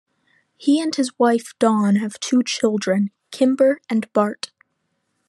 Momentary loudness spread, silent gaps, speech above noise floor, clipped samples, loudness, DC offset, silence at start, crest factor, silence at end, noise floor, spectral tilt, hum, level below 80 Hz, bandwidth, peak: 7 LU; none; 53 dB; under 0.1%; -20 LUFS; under 0.1%; 0.6 s; 18 dB; 0.8 s; -72 dBFS; -5 dB/octave; none; -74 dBFS; 12 kHz; -2 dBFS